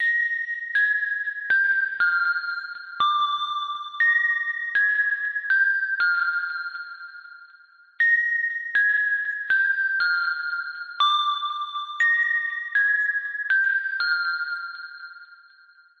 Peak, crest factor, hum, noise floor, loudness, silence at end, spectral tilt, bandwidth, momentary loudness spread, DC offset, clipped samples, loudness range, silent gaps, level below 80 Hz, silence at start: -12 dBFS; 14 dB; none; -54 dBFS; -22 LUFS; 0.65 s; 1.5 dB/octave; 7.4 kHz; 12 LU; under 0.1%; under 0.1%; 2 LU; none; -82 dBFS; 0 s